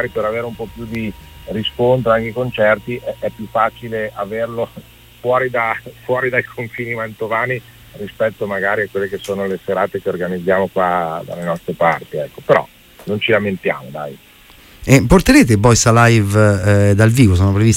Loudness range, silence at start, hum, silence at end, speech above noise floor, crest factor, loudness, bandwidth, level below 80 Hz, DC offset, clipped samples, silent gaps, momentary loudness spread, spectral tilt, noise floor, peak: 8 LU; 0 s; none; 0 s; 28 dB; 16 dB; -16 LUFS; 16.5 kHz; -36 dBFS; under 0.1%; under 0.1%; none; 15 LU; -5.5 dB/octave; -43 dBFS; 0 dBFS